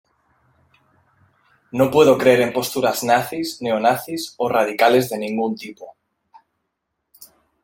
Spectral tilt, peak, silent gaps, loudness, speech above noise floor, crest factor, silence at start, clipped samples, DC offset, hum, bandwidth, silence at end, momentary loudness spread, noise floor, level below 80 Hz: -4.5 dB/octave; -2 dBFS; none; -18 LUFS; 58 dB; 20 dB; 1.75 s; under 0.1%; under 0.1%; none; 17 kHz; 0.4 s; 12 LU; -76 dBFS; -62 dBFS